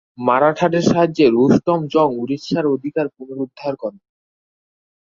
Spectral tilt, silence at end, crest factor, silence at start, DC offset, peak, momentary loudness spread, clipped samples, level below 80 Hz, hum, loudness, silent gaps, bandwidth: -7 dB/octave; 1.15 s; 18 dB; 0.2 s; under 0.1%; 0 dBFS; 12 LU; under 0.1%; -56 dBFS; none; -17 LUFS; none; 7.6 kHz